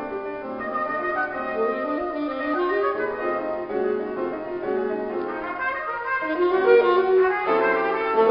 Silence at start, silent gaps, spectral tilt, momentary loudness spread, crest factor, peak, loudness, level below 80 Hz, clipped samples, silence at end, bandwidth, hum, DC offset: 0 s; none; -8 dB/octave; 10 LU; 18 dB; -6 dBFS; -23 LUFS; -58 dBFS; under 0.1%; 0 s; 5.4 kHz; none; under 0.1%